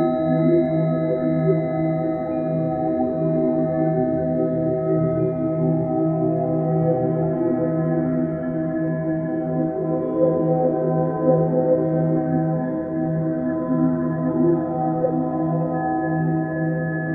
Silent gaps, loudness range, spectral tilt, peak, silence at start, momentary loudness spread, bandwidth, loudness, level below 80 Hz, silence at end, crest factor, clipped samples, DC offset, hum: none; 2 LU; -12.5 dB/octave; -6 dBFS; 0 s; 4 LU; 4.1 kHz; -21 LUFS; -52 dBFS; 0 s; 14 dB; under 0.1%; under 0.1%; none